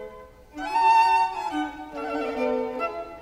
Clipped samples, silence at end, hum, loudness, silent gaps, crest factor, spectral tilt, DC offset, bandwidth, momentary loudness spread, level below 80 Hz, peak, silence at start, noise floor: under 0.1%; 0 s; none; -24 LUFS; none; 14 dB; -3.5 dB/octave; under 0.1%; 12.5 kHz; 16 LU; -54 dBFS; -12 dBFS; 0 s; -45 dBFS